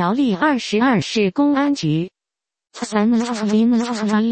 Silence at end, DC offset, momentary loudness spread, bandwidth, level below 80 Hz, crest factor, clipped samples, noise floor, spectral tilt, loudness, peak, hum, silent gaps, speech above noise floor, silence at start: 0 s; under 0.1%; 6 LU; 8.8 kHz; -58 dBFS; 14 dB; under 0.1%; -87 dBFS; -5.5 dB/octave; -18 LUFS; -4 dBFS; none; none; 70 dB; 0 s